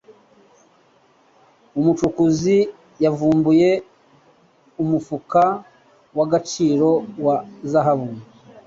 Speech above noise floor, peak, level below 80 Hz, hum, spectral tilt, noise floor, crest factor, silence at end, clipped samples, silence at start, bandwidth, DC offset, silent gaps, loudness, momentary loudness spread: 38 dB; -4 dBFS; -56 dBFS; none; -7 dB/octave; -56 dBFS; 16 dB; 0.45 s; under 0.1%; 1.75 s; 7.8 kHz; under 0.1%; none; -19 LUFS; 11 LU